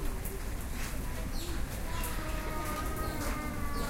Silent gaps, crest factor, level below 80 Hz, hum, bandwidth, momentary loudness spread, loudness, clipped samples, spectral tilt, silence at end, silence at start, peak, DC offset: none; 14 dB; -36 dBFS; none; 16.5 kHz; 3 LU; -37 LUFS; under 0.1%; -4.5 dB/octave; 0 s; 0 s; -22 dBFS; under 0.1%